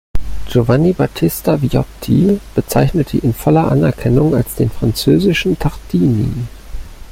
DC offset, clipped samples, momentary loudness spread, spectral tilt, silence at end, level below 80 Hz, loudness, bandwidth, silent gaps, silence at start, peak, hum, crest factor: under 0.1%; under 0.1%; 10 LU; -7 dB/octave; 0 s; -30 dBFS; -15 LUFS; 16.5 kHz; none; 0.15 s; -2 dBFS; none; 12 dB